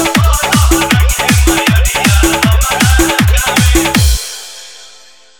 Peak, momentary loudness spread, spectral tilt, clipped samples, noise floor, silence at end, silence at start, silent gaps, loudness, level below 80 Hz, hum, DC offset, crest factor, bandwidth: 0 dBFS; 6 LU; -4 dB/octave; under 0.1%; -41 dBFS; 0.5 s; 0 s; none; -10 LUFS; -14 dBFS; none; under 0.1%; 10 dB; over 20 kHz